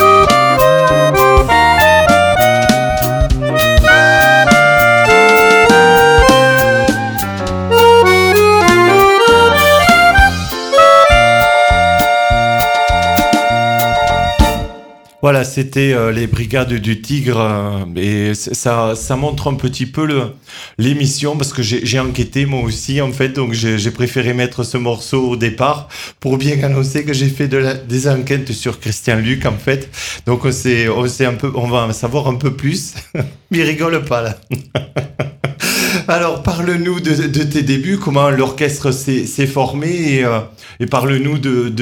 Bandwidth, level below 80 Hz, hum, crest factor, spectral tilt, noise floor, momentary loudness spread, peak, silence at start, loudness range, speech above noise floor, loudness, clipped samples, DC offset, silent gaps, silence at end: over 20 kHz; -28 dBFS; none; 12 dB; -5 dB/octave; -37 dBFS; 11 LU; 0 dBFS; 0 s; 9 LU; 21 dB; -12 LUFS; under 0.1%; under 0.1%; none; 0 s